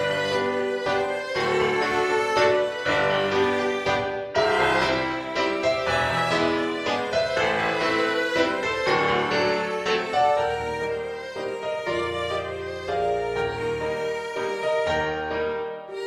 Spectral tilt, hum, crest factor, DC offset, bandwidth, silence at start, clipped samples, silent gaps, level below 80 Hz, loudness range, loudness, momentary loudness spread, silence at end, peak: -4.5 dB/octave; none; 16 dB; under 0.1%; 14 kHz; 0 s; under 0.1%; none; -52 dBFS; 5 LU; -24 LUFS; 7 LU; 0 s; -8 dBFS